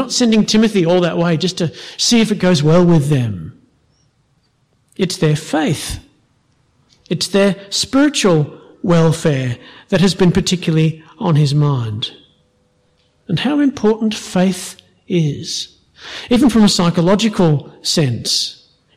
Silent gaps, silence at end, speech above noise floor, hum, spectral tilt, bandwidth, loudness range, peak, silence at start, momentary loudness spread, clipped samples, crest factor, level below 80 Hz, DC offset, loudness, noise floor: none; 0.45 s; 45 dB; none; -5.5 dB/octave; 14 kHz; 5 LU; -4 dBFS; 0 s; 12 LU; under 0.1%; 12 dB; -42 dBFS; under 0.1%; -15 LUFS; -60 dBFS